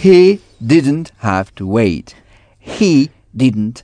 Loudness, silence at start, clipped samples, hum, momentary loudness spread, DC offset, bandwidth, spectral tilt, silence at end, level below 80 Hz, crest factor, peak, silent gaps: -14 LUFS; 0 s; 0.2%; none; 10 LU; under 0.1%; 10 kHz; -7 dB/octave; 0.05 s; -46 dBFS; 14 dB; 0 dBFS; none